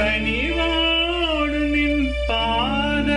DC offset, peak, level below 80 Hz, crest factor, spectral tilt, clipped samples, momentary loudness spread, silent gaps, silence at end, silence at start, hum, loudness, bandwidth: under 0.1%; -10 dBFS; -30 dBFS; 12 dB; -5.5 dB/octave; under 0.1%; 3 LU; none; 0 s; 0 s; none; -20 LUFS; 10.5 kHz